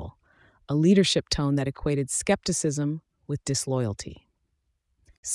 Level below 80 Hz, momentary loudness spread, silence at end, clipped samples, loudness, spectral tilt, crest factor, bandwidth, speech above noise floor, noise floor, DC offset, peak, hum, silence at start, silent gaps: -48 dBFS; 17 LU; 0 s; under 0.1%; -25 LUFS; -4.5 dB/octave; 18 dB; 12 kHz; 50 dB; -75 dBFS; under 0.1%; -10 dBFS; none; 0 s; 5.17-5.23 s